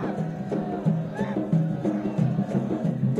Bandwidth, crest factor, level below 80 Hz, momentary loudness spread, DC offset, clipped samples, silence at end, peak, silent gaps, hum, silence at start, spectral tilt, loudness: 7.6 kHz; 14 dB; -56 dBFS; 4 LU; under 0.1%; under 0.1%; 0 s; -12 dBFS; none; none; 0 s; -9.5 dB/octave; -27 LUFS